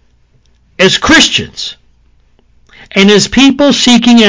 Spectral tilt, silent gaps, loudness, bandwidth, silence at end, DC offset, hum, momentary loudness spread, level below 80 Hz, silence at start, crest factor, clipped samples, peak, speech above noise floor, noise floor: -3.5 dB/octave; none; -7 LUFS; 8 kHz; 0 s; under 0.1%; none; 13 LU; -36 dBFS; 0.8 s; 10 dB; 1%; 0 dBFS; 42 dB; -48 dBFS